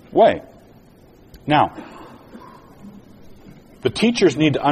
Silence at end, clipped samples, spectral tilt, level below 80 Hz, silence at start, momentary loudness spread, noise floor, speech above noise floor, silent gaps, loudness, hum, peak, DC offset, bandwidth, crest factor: 0 s; under 0.1%; -5.5 dB/octave; -50 dBFS; 0.1 s; 25 LU; -48 dBFS; 32 dB; none; -18 LUFS; none; -2 dBFS; under 0.1%; 13.5 kHz; 18 dB